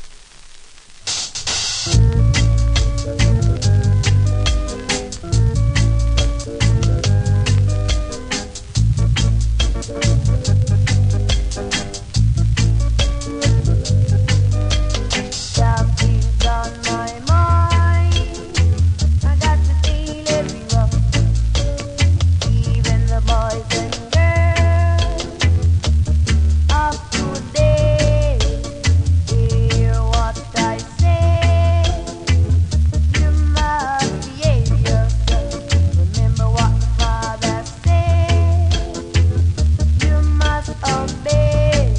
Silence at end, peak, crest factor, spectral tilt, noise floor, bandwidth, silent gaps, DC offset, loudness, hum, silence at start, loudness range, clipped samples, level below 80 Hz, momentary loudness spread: 0 s; -2 dBFS; 14 dB; -5 dB/octave; -39 dBFS; 10.5 kHz; none; under 0.1%; -17 LUFS; none; 0 s; 1 LU; under 0.1%; -18 dBFS; 6 LU